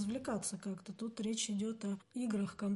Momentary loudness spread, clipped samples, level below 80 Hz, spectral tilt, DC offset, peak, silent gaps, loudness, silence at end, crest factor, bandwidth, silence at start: 7 LU; under 0.1%; -72 dBFS; -4.5 dB/octave; under 0.1%; -26 dBFS; none; -40 LUFS; 0 s; 12 dB; 11.5 kHz; 0 s